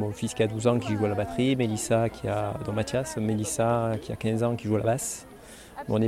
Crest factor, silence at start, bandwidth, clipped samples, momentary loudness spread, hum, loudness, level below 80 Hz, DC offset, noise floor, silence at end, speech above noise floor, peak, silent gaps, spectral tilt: 18 dB; 0 s; 15 kHz; under 0.1%; 7 LU; none; -27 LUFS; -52 dBFS; under 0.1%; -47 dBFS; 0 s; 20 dB; -10 dBFS; none; -5.5 dB/octave